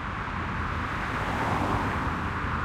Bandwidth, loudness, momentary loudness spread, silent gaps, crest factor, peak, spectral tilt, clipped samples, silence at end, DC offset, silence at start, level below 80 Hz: 15.5 kHz; -29 LUFS; 4 LU; none; 14 dB; -14 dBFS; -6 dB/octave; under 0.1%; 0 s; under 0.1%; 0 s; -40 dBFS